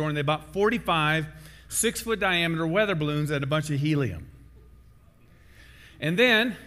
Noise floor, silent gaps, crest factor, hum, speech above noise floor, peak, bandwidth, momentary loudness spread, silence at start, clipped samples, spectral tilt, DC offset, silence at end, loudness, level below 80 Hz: -55 dBFS; none; 16 dB; none; 29 dB; -10 dBFS; 16 kHz; 9 LU; 0 s; under 0.1%; -4.5 dB/octave; under 0.1%; 0 s; -25 LUFS; -50 dBFS